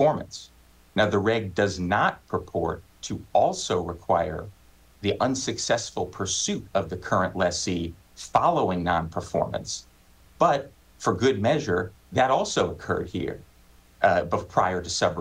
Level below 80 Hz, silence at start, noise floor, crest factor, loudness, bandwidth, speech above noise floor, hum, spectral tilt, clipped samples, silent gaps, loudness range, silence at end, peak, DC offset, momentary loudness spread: -50 dBFS; 0 s; -55 dBFS; 20 dB; -26 LUFS; 16 kHz; 30 dB; none; -4.5 dB/octave; under 0.1%; none; 2 LU; 0 s; -6 dBFS; under 0.1%; 10 LU